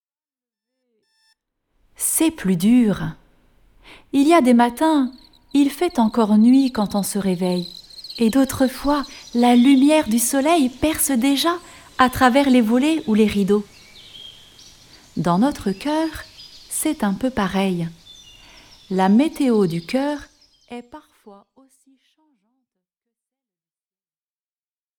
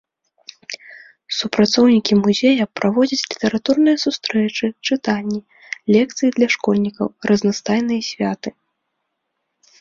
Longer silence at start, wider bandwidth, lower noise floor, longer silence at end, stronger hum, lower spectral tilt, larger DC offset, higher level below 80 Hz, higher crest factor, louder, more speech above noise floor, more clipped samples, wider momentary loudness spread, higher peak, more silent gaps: first, 2 s vs 0.7 s; first, 19.5 kHz vs 7.6 kHz; first, under -90 dBFS vs -75 dBFS; first, 3.7 s vs 1.3 s; neither; about the same, -5 dB/octave vs -5 dB/octave; neither; first, -48 dBFS vs -58 dBFS; about the same, 20 dB vs 18 dB; about the same, -18 LUFS vs -18 LUFS; first, over 73 dB vs 58 dB; neither; first, 17 LU vs 14 LU; about the same, 0 dBFS vs 0 dBFS; neither